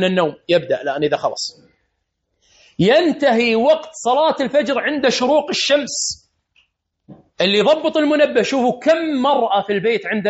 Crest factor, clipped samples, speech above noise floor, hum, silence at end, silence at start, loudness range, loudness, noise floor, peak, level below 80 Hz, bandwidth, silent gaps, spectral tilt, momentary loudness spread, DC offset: 14 dB; under 0.1%; 55 dB; none; 0 s; 0 s; 3 LU; -17 LUFS; -72 dBFS; -4 dBFS; -60 dBFS; 8 kHz; none; -3 dB/octave; 6 LU; under 0.1%